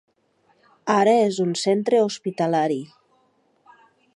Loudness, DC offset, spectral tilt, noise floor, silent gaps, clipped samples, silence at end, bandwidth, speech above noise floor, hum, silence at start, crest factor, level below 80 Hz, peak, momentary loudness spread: -21 LUFS; under 0.1%; -5 dB/octave; -64 dBFS; none; under 0.1%; 1.3 s; 11.5 kHz; 44 dB; none; 0.85 s; 18 dB; -76 dBFS; -4 dBFS; 11 LU